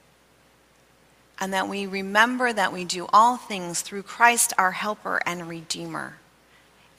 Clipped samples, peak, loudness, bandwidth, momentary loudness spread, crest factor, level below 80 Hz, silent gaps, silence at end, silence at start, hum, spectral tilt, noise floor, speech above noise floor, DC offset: under 0.1%; -2 dBFS; -23 LUFS; 16 kHz; 15 LU; 22 dB; -68 dBFS; none; 0.85 s; 1.4 s; none; -2 dB/octave; -59 dBFS; 35 dB; under 0.1%